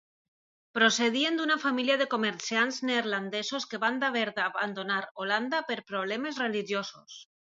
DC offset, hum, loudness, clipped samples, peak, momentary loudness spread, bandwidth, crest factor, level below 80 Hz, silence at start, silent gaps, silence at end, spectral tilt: under 0.1%; none; -29 LUFS; under 0.1%; -8 dBFS; 8 LU; 7.8 kHz; 22 dB; -82 dBFS; 0.75 s; 5.11-5.15 s; 0.35 s; -2.5 dB/octave